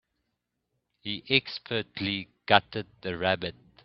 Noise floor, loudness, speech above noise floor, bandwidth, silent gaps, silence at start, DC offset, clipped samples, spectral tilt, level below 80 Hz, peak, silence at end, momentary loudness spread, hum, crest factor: -81 dBFS; -28 LUFS; 53 dB; 6 kHz; none; 1.05 s; under 0.1%; under 0.1%; -1.5 dB/octave; -64 dBFS; 0 dBFS; 0.35 s; 13 LU; none; 30 dB